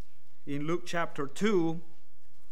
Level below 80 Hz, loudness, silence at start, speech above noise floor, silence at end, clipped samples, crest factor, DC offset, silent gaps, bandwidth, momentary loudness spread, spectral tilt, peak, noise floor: -70 dBFS; -32 LUFS; 0.45 s; 34 dB; 0.7 s; under 0.1%; 18 dB; 4%; none; 15 kHz; 13 LU; -6 dB/octave; -16 dBFS; -65 dBFS